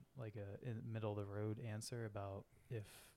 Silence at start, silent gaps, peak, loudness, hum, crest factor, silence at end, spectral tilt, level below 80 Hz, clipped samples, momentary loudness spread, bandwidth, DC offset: 0 s; none; -32 dBFS; -49 LUFS; none; 16 dB; 0 s; -6.5 dB/octave; -76 dBFS; under 0.1%; 6 LU; 15 kHz; under 0.1%